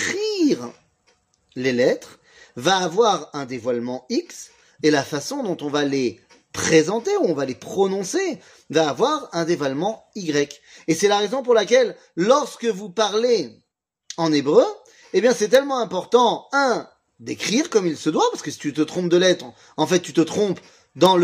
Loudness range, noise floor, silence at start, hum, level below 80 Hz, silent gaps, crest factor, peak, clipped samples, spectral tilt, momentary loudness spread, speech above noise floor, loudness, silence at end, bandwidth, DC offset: 3 LU; -73 dBFS; 0 s; none; -68 dBFS; none; 20 dB; -2 dBFS; under 0.1%; -4 dB/octave; 10 LU; 53 dB; -21 LUFS; 0 s; 15.5 kHz; under 0.1%